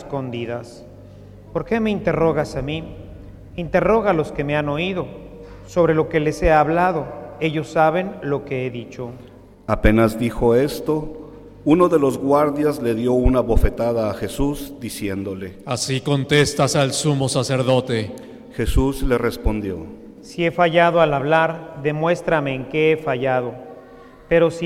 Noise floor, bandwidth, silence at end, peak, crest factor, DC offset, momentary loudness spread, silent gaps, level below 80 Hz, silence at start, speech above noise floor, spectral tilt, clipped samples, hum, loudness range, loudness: -43 dBFS; 16.5 kHz; 0 s; -2 dBFS; 18 dB; under 0.1%; 16 LU; none; -32 dBFS; 0 s; 24 dB; -5.5 dB/octave; under 0.1%; none; 4 LU; -20 LUFS